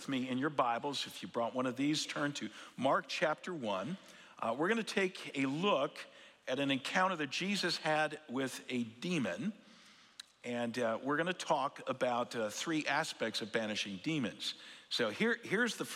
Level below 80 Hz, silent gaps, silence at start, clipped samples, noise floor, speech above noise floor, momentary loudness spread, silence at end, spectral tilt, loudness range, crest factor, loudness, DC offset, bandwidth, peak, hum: -86 dBFS; none; 0 s; under 0.1%; -61 dBFS; 25 dB; 9 LU; 0 s; -4 dB/octave; 3 LU; 20 dB; -36 LUFS; under 0.1%; 16 kHz; -16 dBFS; none